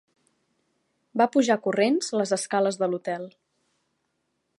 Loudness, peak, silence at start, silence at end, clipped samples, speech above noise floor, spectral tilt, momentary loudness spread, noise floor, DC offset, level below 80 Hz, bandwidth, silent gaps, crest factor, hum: -25 LUFS; -6 dBFS; 1.15 s; 1.3 s; under 0.1%; 52 dB; -4.5 dB/octave; 11 LU; -76 dBFS; under 0.1%; -80 dBFS; 11.5 kHz; none; 20 dB; none